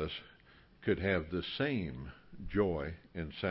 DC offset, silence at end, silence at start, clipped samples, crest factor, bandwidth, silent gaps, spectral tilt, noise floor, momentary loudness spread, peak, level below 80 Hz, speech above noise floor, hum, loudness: under 0.1%; 0 s; 0 s; under 0.1%; 20 dB; 5.6 kHz; none; -4.5 dB/octave; -62 dBFS; 13 LU; -18 dBFS; -52 dBFS; 26 dB; none; -36 LUFS